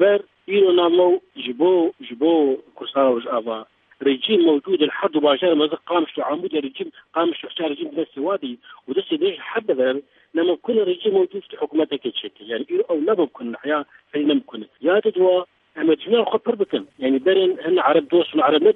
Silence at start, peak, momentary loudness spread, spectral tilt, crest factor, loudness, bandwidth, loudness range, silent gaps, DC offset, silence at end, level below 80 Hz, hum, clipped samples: 0 s; -4 dBFS; 10 LU; -8 dB/octave; 16 dB; -20 LUFS; 4 kHz; 5 LU; none; under 0.1%; 0 s; -76 dBFS; none; under 0.1%